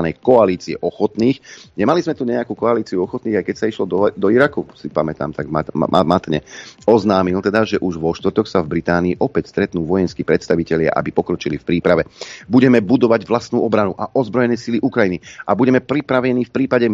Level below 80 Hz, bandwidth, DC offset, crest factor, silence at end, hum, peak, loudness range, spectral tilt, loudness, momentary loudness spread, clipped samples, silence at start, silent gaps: -48 dBFS; 7.6 kHz; under 0.1%; 16 dB; 0 s; none; 0 dBFS; 2 LU; -7 dB/octave; -17 LUFS; 8 LU; under 0.1%; 0 s; none